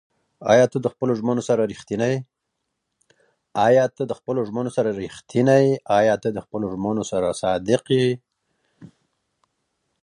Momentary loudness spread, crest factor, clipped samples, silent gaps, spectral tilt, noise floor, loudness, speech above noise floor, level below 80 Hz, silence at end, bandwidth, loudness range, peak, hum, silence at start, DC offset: 11 LU; 20 dB; under 0.1%; none; -6 dB/octave; -78 dBFS; -21 LUFS; 58 dB; -58 dBFS; 1.15 s; 11 kHz; 4 LU; -2 dBFS; none; 0.4 s; under 0.1%